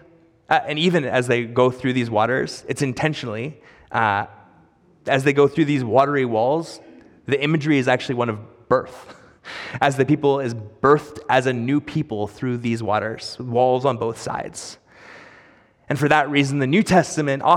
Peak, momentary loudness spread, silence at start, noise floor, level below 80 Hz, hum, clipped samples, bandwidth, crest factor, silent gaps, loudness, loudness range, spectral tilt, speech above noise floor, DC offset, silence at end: -2 dBFS; 13 LU; 0.5 s; -55 dBFS; -58 dBFS; none; under 0.1%; 14.5 kHz; 18 dB; none; -20 LUFS; 3 LU; -6 dB/octave; 35 dB; under 0.1%; 0 s